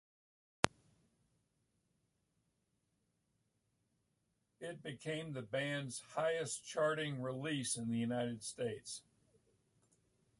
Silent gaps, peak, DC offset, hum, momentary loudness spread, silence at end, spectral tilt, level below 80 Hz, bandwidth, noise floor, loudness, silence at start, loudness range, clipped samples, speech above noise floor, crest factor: none; -4 dBFS; under 0.1%; none; 10 LU; 1.4 s; -4 dB/octave; -72 dBFS; 11.5 kHz; -83 dBFS; -40 LUFS; 0.65 s; 12 LU; under 0.1%; 43 dB; 40 dB